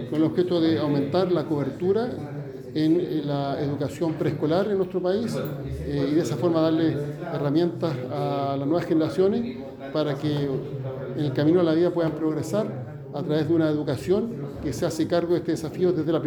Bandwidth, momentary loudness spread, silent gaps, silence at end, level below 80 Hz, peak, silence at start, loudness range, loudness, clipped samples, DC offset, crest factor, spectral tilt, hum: 19.5 kHz; 9 LU; none; 0 s; -52 dBFS; -10 dBFS; 0 s; 2 LU; -25 LUFS; under 0.1%; under 0.1%; 14 dB; -7.5 dB/octave; none